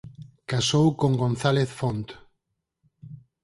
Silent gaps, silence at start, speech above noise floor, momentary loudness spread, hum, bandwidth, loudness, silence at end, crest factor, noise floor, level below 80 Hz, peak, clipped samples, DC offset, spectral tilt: none; 0.05 s; 56 dB; 19 LU; none; 11.5 kHz; -24 LUFS; 0.25 s; 20 dB; -79 dBFS; -56 dBFS; -6 dBFS; under 0.1%; under 0.1%; -5.5 dB/octave